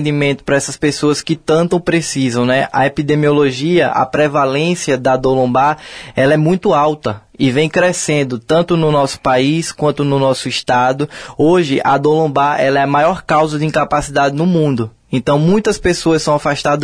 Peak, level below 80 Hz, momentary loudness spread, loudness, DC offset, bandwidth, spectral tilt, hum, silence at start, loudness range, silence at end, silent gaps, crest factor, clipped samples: -2 dBFS; -42 dBFS; 4 LU; -14 LUFS; under 0.1%; 10.5 kHz; -5.5 dB/octave; none; 0 s; 1 LU; 0 s; none; 12 dB; under 0.1%